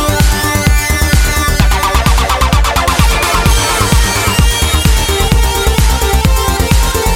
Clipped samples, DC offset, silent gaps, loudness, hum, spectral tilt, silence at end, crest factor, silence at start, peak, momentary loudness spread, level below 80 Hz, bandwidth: 0.3%; under 0.1%; none; -11 LUFS; none; -3.5 dB/octave; 0 s; 10 dB; 0 s; 0 dBFS; 1 LU; -12 dBFS; 17 kHz